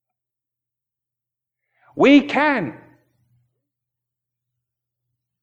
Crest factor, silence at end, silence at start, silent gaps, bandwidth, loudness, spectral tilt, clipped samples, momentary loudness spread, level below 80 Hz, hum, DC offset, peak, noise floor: 22 dB; 2.7 s; 1.95 s; none; 7.4 kHz; -16 LUFS; -6 dB/octave; under 0.1%; 18 LU; -66 dBFS; none; under 0.1%; -2 dBFS; -86 dBFS